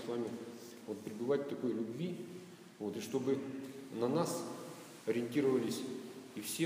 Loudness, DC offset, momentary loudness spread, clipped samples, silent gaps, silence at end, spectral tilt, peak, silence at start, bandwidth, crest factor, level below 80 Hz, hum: -39 LUFS; under 0.1%; 14 LU; under 0.1%; none; 0 s; -5.5 dB/octave; -20 dBFS; 0 s; 15.5 kHz; 18 dB; -86 dBFS; none